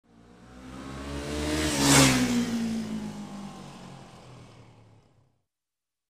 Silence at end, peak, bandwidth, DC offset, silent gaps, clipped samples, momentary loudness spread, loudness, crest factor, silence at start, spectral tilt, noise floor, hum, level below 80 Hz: 1.65 s; -6 dBFS; 15.5 kHz; under 0.1%; none; under 0.1%; 27 LU; -25 LUFS; 24 dB; 0.4 s; -3.5 dB/octave; under -90 dBFS; none; -46 dBFS